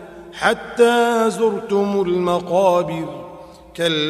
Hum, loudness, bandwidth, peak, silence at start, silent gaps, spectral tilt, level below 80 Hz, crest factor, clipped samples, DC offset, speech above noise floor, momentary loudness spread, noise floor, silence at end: none; -18 LUFS; 14 kHz; -2 dBFS; 0 s; none; -5 dB/octave; -54 dBFS; 16 dB; under 0.1%; under 0.1%; 22 dB; 17 LU; -39 dBFS; 0 s